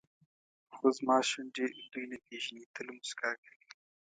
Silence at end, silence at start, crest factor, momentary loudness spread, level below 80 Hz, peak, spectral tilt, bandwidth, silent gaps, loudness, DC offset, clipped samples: 0.8 s; 0.7 s; 22 dB; 15 LU; -88 dBFS; -14 dBFS; -2 dB/octave; 9.4 kHz; 2.66-2.74 s; -35 LUFS; under 0.1%; under 0.1%